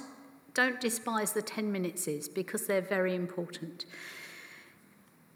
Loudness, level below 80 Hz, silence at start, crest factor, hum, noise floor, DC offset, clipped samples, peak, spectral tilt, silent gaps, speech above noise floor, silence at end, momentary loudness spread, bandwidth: -33 LUFS; under -90 dBFS; 0 s; 22 dB; none; -61 dBFS; under 0.1%; under 0.1%; -12 dBFS; -3.5 dB/octave; none; 28 dB; 0.65 s; 17 LU; over 20 kHz